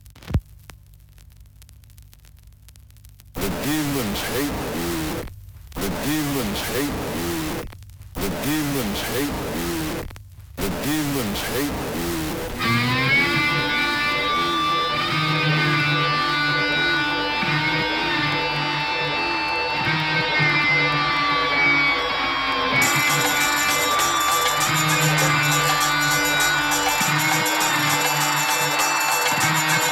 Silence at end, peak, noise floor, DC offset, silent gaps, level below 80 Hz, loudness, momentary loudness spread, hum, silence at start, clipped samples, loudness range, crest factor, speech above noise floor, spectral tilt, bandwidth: 0 s; -6 dBFS; -47 dBFS; under 0.1%; none; -42 dBFS; -20 LUFS; 9 LU; none; 0.05 s; under 0.1%; 9 LU; 16 dB; 22 dB; -3 dB/octave; over 20 kHz